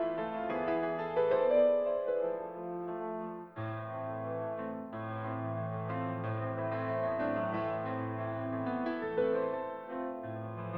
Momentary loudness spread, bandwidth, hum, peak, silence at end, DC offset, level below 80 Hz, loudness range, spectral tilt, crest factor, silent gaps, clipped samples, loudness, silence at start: 11 LU; 18 kHz; none; -18 dBFS; 0 s; under 0.1%; -72 dBFS; 7 LU; -10 dB/octave; 16 dB; none; under 0.1%; -35 LUFS; 0 s